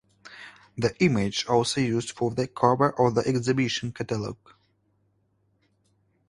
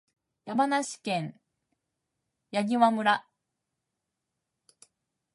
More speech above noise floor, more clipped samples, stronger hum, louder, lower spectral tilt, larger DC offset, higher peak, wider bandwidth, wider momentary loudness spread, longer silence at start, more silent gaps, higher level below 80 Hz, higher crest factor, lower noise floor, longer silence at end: second, 45 dB vs 58 dB; neither; neither; first, -25 LUFS vs -28 LUFS; about the same, -5.5 dB/octave vs -4.5 dB/octave; neither; first, -4 dBFS vs -10 dBFS; about the same, 11.5 kHz vs 11.5 kHz; first, 18 LU vs 11 LU; second, 0.25 s vs 0.45 s; neither; first, -58 dBFS vs -84 dBFS; about the same, 22 dB vs 22 dB; second, -69 dBFS vs -85 dBFS; second, 1.95 s vs 2.15 s